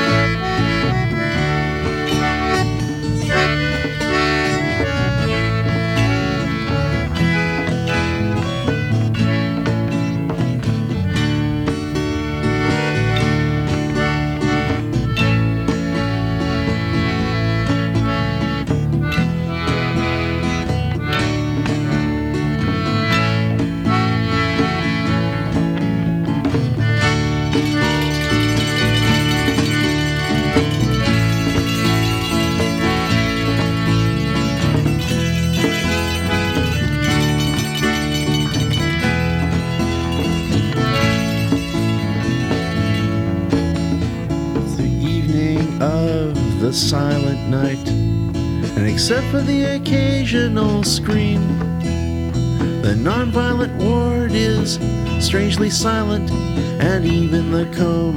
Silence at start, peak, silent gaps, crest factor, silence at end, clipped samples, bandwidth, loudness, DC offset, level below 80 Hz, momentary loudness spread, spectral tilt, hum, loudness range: 0 s; -2 dBFS; none; 16 dB; 0 s; under 0.1%; 17 kHz; -18 LUFS; under 0.1%; -32 dBFS; 4 LU; -5.5 dB/octave; none; 2 LU